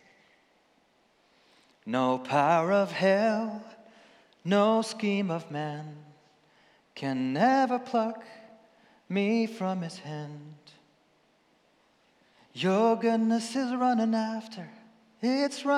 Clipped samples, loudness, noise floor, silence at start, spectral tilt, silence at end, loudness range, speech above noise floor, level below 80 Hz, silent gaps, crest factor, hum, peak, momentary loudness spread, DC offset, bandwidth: under 0.1%; -28 LUFS; -67 dBFS; 1.85 s; -6 dB/octave; 0 s; 7 LU; 40 dB; -88 dBFS; none; 18 dB; none; -12 dBFS; 19 LU; under 0.1%; 12 kHz